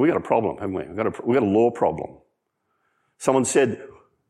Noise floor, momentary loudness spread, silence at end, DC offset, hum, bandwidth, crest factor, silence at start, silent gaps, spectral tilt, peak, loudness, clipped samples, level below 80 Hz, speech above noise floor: -74 dBFS; 11 LU; 0.4 s; under 0.1%; none; 13 kHz; 18 dB; 0 s; none; -5.5 dB/octave; -4 dBFS; -22 LUFS; under 0.1%; -62 dBFS; 52 dB